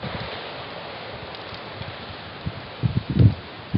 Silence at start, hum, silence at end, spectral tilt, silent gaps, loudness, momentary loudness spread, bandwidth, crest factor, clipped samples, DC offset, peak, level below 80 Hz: 0 s; none; 0 s; -10.5 dB/octave; none; -27 LUFS; 15 LU; 5.6 kHz; 22 dB; under 0.1%; under 0.1%; -4 dBFS; -42 dBFS